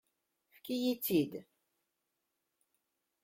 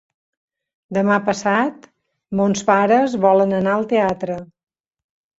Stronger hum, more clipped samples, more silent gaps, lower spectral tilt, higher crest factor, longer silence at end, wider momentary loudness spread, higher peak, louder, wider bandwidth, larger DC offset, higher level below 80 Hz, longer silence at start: neither; neither; neither; about the same, -5 dB/octave vs -6 dB/octave; about the same, 20 dB vs 18 dB; first, 1.8 s vs 0.95 s; first, 18 LU vs 11 LU; second, -20 dBFS vs -2 dBFS; second, -35 LUFS vs -18 LUFS; first, 16.5 kHz vs 8 kHz; neither; second, -78 dBFS vs -58 dBFS; second, 0.65 s vs 0.9 s